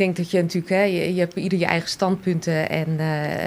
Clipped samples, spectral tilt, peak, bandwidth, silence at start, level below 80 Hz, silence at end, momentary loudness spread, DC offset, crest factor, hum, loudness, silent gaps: under 0.1%; -6 dB/octave; -4 dBFS; 15 kHz; 0 s; -58 dBFS; 0 s; 3 LU; under 0.1%; 18 dB; none; -22 LUFS; none